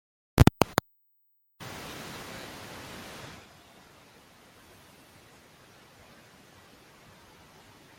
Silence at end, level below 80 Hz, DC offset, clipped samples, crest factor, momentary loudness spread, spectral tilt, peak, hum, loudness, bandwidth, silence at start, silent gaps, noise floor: 4.6 s; -44 dBFS; under 0.1%; under 0.1%; 32 dB; 31 LU; -5.5 dB/octave; -2 dBFS; none; -30 LUFS; 16.5 kHz; 0.35 s; none; -70 dBFS